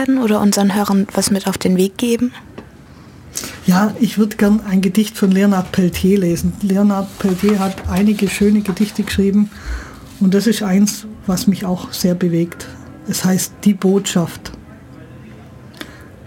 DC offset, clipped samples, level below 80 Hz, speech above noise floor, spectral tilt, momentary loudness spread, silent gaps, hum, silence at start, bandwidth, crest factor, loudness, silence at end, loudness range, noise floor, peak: under 0.1%; under 0.1%; -40 dBFS; 24 dB; -5.5 dB/octave; 14 LU; none; none; 0 s; 17 kHz; 14 dB; -16 LUFS; 0.2 s; 3 LU; -40 dBFS; -2 dBFS